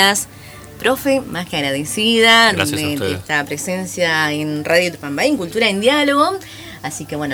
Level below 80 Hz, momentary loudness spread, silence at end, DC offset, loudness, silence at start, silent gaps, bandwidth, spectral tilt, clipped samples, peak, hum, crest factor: -50 dBFS; 16 LU; 0 s; under 0.1%; -16 LUFS; 0 s; none; over 20 kHz; -3 dB/octave; under 0.1%; 0 dBFS; none; 18 dB